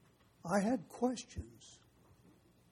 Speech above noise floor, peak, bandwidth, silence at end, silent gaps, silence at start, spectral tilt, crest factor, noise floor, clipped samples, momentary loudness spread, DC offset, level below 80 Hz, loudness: 29 dB; -20 dBFS; 13.5 kHz; 0.95 s; none; 0.45 s; -5.5 dB/octave; 22 dB; -66 dBFS; under 0.1%; 22 LU; under 0.1%; -60 dBFS; -38 LUFS